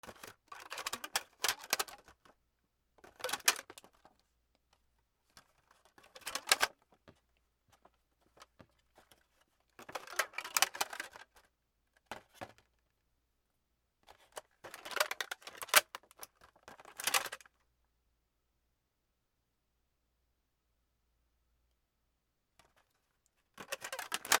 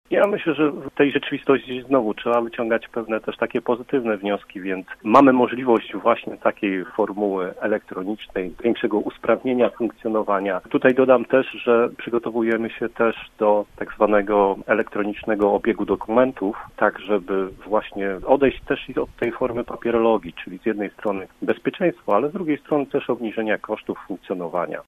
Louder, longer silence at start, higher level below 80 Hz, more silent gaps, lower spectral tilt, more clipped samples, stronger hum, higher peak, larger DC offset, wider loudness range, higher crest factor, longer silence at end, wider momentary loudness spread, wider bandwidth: second, -35 LUFS vs -22 LUFS; about the same, 0.05 s vs 0.1 s; second, -78 dBFS vs -52 dBFS; neither; second, 1.5 dB/octave vs -7.5 dB/octave; neither; neither; second, -8 dBFS vs 0 dBFS; neither; first, 15 LU vs 4 LU; first, 36 dB vs 22 dB; about the same, 0 s vs 0.05 s; first, 23 LU vs 9 LU; first, 19.5 kHz vs 13.5 kHz